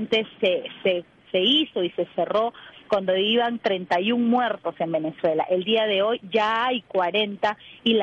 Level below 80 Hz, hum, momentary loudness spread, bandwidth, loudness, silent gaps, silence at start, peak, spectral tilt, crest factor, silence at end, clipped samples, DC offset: -68 dBFS; none; 6 LU; 7.6 kHz; -23 LUFS; none; 0 s; -10 dBFS; -6 dB/octave; 14 dB; 0 s; under 0.1%; under 0.1%